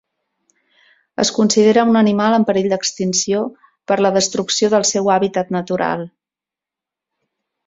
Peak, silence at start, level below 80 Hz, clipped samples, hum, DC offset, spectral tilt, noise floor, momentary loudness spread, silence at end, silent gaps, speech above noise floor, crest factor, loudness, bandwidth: 0 dBFS; 1.2 s; -60 dBFS; under 0.1%; none; under 0.1%; -4 dB/octave; -88 dBFS; 9 LU; 1.6 s; none; 72 dB; 18 dB; -16 LUFS; 7.8 kHz